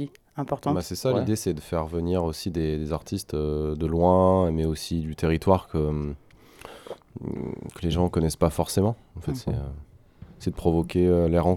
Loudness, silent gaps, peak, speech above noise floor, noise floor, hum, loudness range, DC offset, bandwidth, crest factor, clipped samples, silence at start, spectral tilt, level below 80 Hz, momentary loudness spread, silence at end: -26 LUFS; none; -4 dBFS; 24 dB; -49 dBFS; none; 4 LU; under 0.1%; 17 kHz; 20 dB; under 0.1%; 0 s; -7 dB/octave; -42 dBFS; 14 LU; 0 s